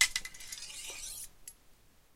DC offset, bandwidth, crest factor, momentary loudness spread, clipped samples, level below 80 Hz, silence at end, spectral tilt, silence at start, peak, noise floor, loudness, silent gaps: under 0.1%; 16.5 kHz; 30 dB; 15 LU; under 0.1%; -58 dBFS; 0.15 s; 2.5 dB/octave; 0 s; -8 dBFS; -61 dBFS; -38 LUFS; none